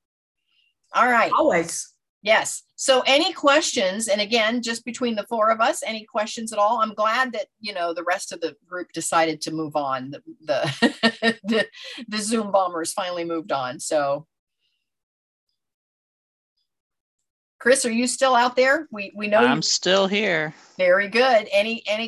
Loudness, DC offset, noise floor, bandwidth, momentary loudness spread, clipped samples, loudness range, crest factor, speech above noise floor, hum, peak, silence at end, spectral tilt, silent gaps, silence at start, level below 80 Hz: -21 LUFS; under 0.1%; -75 dBFS; 13 kHz; 11 LU; under 0.1%; 8 LU; 18 dB; 53 dB; none; -4 dBFS; 0 s; -2.5 dB/octave; 2.09-2.21 s, 14.39-14.47 s, 15.03-15.47 s, 15.74-16.56 s, 16.80-16.90 s, 17.01-17.18 s, 17.30-17.59 s; 0.95 s; -70 dBFS